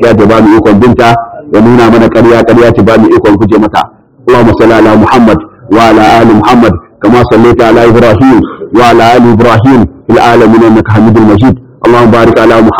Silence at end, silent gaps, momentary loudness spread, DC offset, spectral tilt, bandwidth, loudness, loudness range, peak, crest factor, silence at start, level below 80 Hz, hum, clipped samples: 0 s; none; 5 LU; 4%; -7.5 dB/octave; 13.5 kHz; -4 LUFS; 1 LU; 0 dBFS; 4 dB; 0 s; -28 dBFS; none; 40%